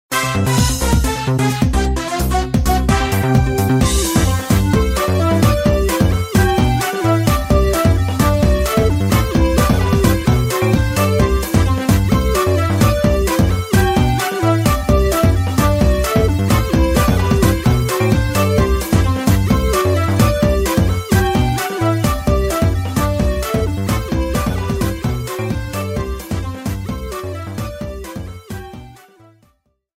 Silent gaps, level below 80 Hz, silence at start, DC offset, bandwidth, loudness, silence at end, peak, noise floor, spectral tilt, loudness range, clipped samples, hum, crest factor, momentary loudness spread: none; -22 dBFS; 0.1 s; under 0.1%; 16.5 kHz; -16 LUFS; 1.05 s; 0 dBFS; -60 dBFS; -6 dB/octave; 7 LU; under 0.1%; none; 14 dB; 8 LU